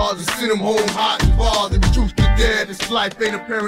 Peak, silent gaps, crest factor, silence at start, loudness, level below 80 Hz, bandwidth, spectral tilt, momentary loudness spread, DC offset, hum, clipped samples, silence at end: -2 dBFS; none; 14 dB; 0 s; -18 LUFS; -20 dBFS; 16 kHz; -4.5 dB/octave; 4 LU; under 0.1%; none; under 0.1%; 0 s